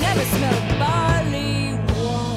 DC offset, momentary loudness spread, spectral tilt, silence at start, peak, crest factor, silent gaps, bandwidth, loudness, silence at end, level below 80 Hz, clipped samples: under 0.1%; 3 LU; -5.5 dB/octave; 0 s; -6 dBFS; 14 dB; none; 16 kHz; -21 LUFS; 0 s; -32 dBFS; under 0.1%